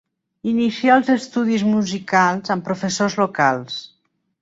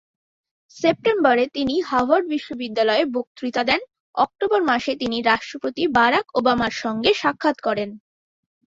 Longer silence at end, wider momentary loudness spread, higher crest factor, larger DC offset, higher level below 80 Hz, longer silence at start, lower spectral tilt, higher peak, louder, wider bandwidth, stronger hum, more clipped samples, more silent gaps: second, 0.55 s vs 0.75 s; about the same, 9 LU vs 9 LU; about the same, 18 dB vs 20 dB; neither; second, -62 dBFS vs -56 dBFS; second, 0.45 s vs 0.75 s; about the same, -5 dB/octave vs -4.5 dB/octave; about the same, -2 dBFS vs -2 dBFS; about the same, -19 LUFS vs -21 LUFS; about the same, 8 kHz vs 7.8 kHz; neither; neither; second, none vs 3.27-3.35 s, 4.00-4.14 s